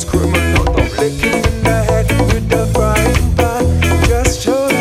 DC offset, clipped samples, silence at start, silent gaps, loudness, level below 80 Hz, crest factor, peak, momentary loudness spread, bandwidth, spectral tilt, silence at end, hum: under 0.1%; under 0.1%; 0 s; none; -14 LUFS; -18 dBFS; 12 dB; 0 dBFS; 2 LU; 16 kHz; -5.5 dB/octave; 0 s; none